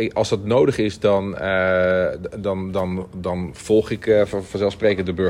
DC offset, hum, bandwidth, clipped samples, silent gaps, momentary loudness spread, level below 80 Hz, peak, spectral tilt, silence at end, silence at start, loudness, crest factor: under 0.1%; none; 13.5 kHz; under 0.1%; none; 9 LU; -48 dBFS; -4 dBFS; -6 dB/octave; 0 s; 0 s; -20 LUFS; 16 dB